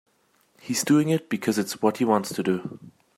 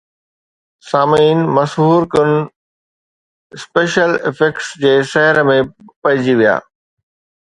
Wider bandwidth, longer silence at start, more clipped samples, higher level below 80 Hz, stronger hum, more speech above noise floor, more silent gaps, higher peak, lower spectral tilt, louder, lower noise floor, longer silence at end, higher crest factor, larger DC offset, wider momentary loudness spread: first, 16 kHz vs 11 kHz; second, 0.65 s vs 0.85 s; neither; second, -70 dBFS vs -54 dBFS; neither; second, 41 dB vs over 77 dB; second, none vs 2.56-3.50 s, 5.96-6.02 s; second, -6 dBFS vs 0 dBFS; about the same, -5 dB/octave vs -6 dB/octave; second, -24 LUFS vs -14 LUFS; second, -65 dBFS vs under -90 dBFS; second, 0.3 s vs 0.85 s; first, 20 dB vs 14 dB; neither; about the same, 9 LU vs 8 LU